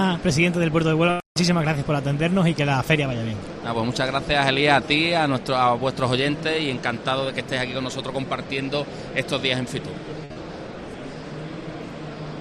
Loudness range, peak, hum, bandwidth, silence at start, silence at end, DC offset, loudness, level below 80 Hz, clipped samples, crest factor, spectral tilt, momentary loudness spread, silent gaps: 7 LU; -4 dBFS; none; 13.5 kHz; 0 s; 0 s; under 0.1%; -22 LUFS; -48 dBFS; under 0.1%; 20 dB; -5.5 dB/octave; 15 LU; 1.26-1.35 s